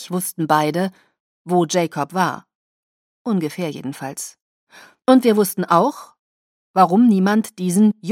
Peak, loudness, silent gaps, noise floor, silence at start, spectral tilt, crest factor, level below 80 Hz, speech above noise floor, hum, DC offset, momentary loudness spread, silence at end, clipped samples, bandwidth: 0 dBFS; -18 LUFS; 1.20-1.45 s, 2.55-3.25 s, 4.42-4.67 s, 6.19-6.74 s; under -90 dBFS; 0 s; -5.5 dB/octave; 18 dB; -72 dBFS; over 72 dB; none; under 0.1%; 15 LU; 0 s; under 0.1%; 16.5 kHz